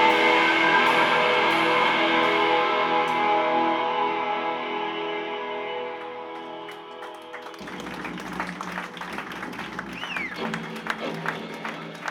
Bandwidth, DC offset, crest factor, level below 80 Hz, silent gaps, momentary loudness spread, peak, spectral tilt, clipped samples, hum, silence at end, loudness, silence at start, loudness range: 18.5 kHz; under 0.1%; 18 dB; -64 dBFS; none; 18 LU; -6 dBFS; -4 dB/octave; under 0.1%; none; 0 s; -24 LUFS; 0 s; 14 LU